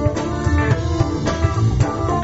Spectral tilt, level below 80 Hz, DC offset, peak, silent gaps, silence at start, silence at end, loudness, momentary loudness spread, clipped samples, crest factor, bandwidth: -7 dB/octave; -26 dBFS; under 0.1%; -4 dBFS; none; 0 s; 0 s; -19 LUFS; 2 LU; under 0.1%; 14 dB; 8 kHz